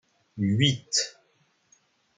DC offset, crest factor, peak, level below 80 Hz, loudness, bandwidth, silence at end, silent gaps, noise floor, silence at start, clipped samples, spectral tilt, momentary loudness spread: under 0.1%; 22 dB; -8 dBFS; -64 dBFS; -25 LUFS; 9.6 kHz; 1.05 s; none; -68 dBFS; 0.35 s; under 0.1%; -3.5 dB/octave; 12 LU